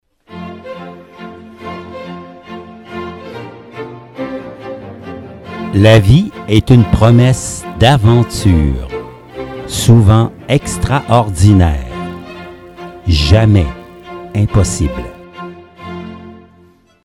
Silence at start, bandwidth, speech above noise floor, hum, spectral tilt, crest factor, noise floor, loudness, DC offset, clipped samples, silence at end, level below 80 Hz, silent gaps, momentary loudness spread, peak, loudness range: 0.3 s; 13 kHz; 38 dB; none; -6.5 dB/octave; 14 dB; -47 dBFS; -11 LUFS; under 0.1%; 0.4%; 0.7 s; -26 dBFS; none; 23 LU; 0 dBFS; 17 LU